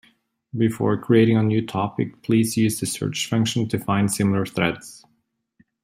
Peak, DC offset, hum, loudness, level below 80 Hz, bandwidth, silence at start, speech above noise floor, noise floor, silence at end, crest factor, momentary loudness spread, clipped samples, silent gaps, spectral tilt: -4 dBFS; under 0.1%; none; -21 LUFS; -58 dBFS; 16 kHz; 0.55 s; 49 dB; -70 dBFS; 0.85 s; 18 dB; 8 LU; under 0.1%; none; -5.5 dB/octave